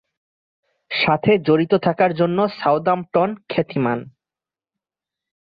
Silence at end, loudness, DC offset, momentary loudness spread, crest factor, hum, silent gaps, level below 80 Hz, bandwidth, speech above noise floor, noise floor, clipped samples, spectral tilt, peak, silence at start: 1.45 s; -19 LUFS; under 0.1%; 7 LU; 18 dB; none; none; -60 dBFS; 5.2 kHz; over 72 dB; under -90 dBFS; under 0.1%; -9.5 dB/octave; -4 dBFS; 0.9 s